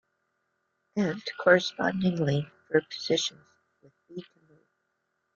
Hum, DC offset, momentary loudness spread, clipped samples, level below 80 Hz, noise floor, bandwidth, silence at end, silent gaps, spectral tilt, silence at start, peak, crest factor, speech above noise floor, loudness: none; under 0.1%; 22 LU; under 0.1%; -68 dBFS; -78 dBFS; 7.6 kHz; 1.15 s; none; -5 dB/octave; 0.95 s; -8 dBFS; 22 dB; 52 dB; -27 LUFS